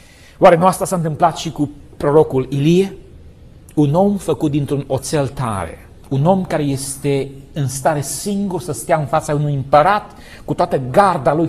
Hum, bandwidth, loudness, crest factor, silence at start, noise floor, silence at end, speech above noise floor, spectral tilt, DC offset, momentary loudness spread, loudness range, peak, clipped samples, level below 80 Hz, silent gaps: none; 14 kHz; -17 LUFS; 16 dB; 0.4 s; -41 dBFS; 0 s; 25 dB; -6 dB/octave; under 0.1%; 11 LU; 4 LU; 0 dBFS; under 0.1%; -42 dBFS; none